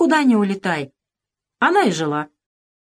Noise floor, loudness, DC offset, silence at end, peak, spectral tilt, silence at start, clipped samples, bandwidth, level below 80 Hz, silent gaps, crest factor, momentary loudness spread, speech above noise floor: -86 dBFS; -19 LUFS; under 0.1%; 0.6 s; -4 dBFS; -5.5 dB/octave; 0 s; under 0.1%; 13.5 kHz; -70 dBFS; none; 14 dB; 13 LU; 68 dB